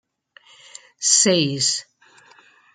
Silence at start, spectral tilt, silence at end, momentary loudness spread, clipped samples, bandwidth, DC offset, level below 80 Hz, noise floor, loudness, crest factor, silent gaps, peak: 1 s; -2 dB/octave; 0.9 s; 9 LU; under 0.1%; 12 kHz; under 0.1%; -68 dBFS; -53 dBFS; -17 LUFS; 22 dB; none; -2 dBFS